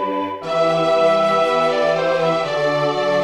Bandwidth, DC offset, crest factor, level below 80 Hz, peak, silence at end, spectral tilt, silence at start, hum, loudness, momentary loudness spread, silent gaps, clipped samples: 11.5 kHz; 0.2%; 12 dB; -60 dBFS; -4 dBFS; 0 s; -5 dB/octave; 0 s; none; -17 LUFS; 5 LU; none; under 0.1%